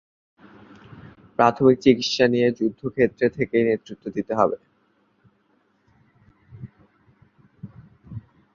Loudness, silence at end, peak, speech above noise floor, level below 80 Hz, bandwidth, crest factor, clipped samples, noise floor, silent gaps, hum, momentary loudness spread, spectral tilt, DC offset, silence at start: -21 LUFS; 0.35 s; -2 dBFS; 45 dB; -58 dBFS; 7.4 kHz; 22 dB; under 0.1%; -65 dBFS; none; none; 26 LU; -6 dB/octave; under 0.1%; 1.4 s